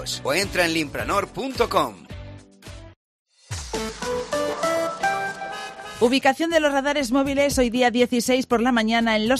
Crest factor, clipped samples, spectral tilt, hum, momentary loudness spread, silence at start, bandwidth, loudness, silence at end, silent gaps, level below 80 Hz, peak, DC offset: 18 dB; under 0.1%; -3.5 dB/octave; none; 15 LU; 0 s; 15 kHz; -22 LUFS; 0 s; 2.96-3.25 s; -44 dBFS; -4 dBFS; under 0.1%